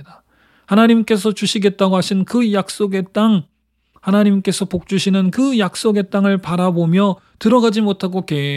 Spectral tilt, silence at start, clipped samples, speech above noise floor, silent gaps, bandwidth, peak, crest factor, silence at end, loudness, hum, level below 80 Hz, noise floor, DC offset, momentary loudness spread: -6 dB/octave; 0 s; under 0.1%; 43 dB; none; 13.5 kHz; 0 dBFS; 16 dB; 0 s; -16 LUFS; none; -56 dBFS; -58 dBFS; under 0.1%; 6 LU